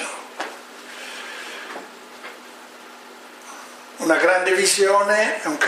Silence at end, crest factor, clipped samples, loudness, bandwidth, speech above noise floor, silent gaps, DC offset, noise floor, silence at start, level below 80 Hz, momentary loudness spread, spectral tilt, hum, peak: 0 s; 20 dB; under 0.1%; -19 LUFS; 15.5 kHz; 24 dB; none; under 0.1%; -42 dBFS; 0 s; -82 dBFS; 24 LU; -1 dB/octave; none; -2 dBFS